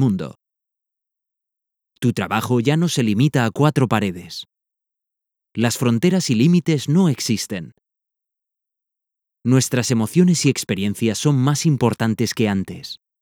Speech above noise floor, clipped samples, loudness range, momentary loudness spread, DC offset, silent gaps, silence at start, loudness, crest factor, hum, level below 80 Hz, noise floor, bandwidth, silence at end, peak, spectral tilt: 66 dB; under 0.1%; 4 LU; 12 LU; under 0.1%; none; 0 s; -19 LUFS; 18 dB; none; -60 dBFS; -84 dBFS; 18.5 kHz; 0.25 s; -2 dBFS; -5.5 dB/octave